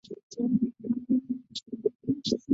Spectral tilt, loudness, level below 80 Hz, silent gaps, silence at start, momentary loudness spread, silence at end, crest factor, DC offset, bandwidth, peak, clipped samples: -6.5 dB/octave; -31 LUFS; -66 dBFS; 0.23-0.30 s; 0.1 s; 8 LU; 0 s; 18 dB; under 0.1%; 7.8 kHz; -12 dBFS; under 0.1%